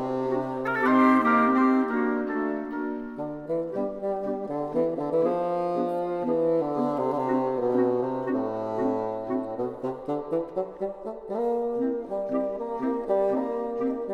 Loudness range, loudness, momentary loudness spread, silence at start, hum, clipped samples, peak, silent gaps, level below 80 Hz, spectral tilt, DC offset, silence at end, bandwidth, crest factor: 6 LU; -27 LUFS; 11 LU; 0 s; none; under 0.1%; -8 dBFS; none; -60 dBFS; -8 dB/octave; under 0.1%; 0 s; 6.6 kHz; 18 dB